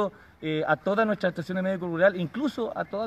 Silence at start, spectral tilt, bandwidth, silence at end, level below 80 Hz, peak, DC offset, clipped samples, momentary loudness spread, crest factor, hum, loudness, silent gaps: 0 s; -7.5 dB/octave; 14 kHz; 0 s; -64 dBFS; -8 dBFS; under 0.1%; under 0.1%; 8 LU; 18 dB; none; -27 LUFS; none